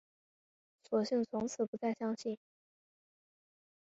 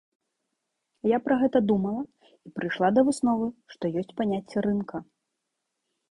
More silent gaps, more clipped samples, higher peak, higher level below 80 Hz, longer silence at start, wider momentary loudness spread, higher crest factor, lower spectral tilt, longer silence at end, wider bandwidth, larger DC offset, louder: first, 1.68-1.73 s vs none; neither; second, -20 dBFS vs -8 dBFS; second, -78 dBFS vs -62 dBFS; second, 0.9 s vs 1.05 s; second, 8 LU vs 12 LU; about the same, 20 dB vs 18 dB; about the same, -5.5 dB/octave vs -6.5 dB/octave; first, 1.6 s vs 1.1 s; second, 7.6 kHz vs 11.5 kHz; neither; second, -37 LUFS vs -26 LUFS